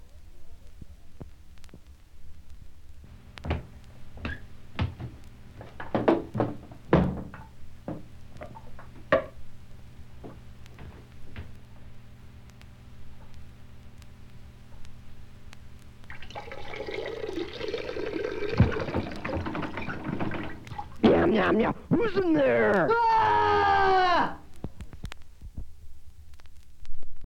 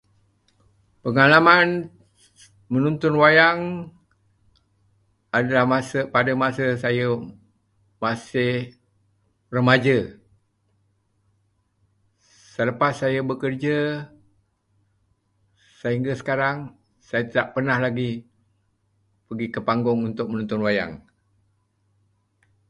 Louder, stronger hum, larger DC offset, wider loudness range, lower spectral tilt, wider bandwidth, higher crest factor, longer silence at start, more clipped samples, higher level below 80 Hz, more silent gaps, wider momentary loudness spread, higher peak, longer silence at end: second, -27 LUFS vs -21 LUFS; neither; neither; first, 25 LU vs 9 LU; about the same, -7.5 dB/octave vs -6.5 dB/octave; second, 9.8 kHz vs 11.5 kHz; about the same, 24 dB vs 24 dB; second, 0 s vs 1.05 s; neither; first, -44 dBFS vs -60 dBFS; neither; first, 28 LU vs 18 LU; second, -6 dBFS vs 0 dBFS; second, 0 s vs 1.7 s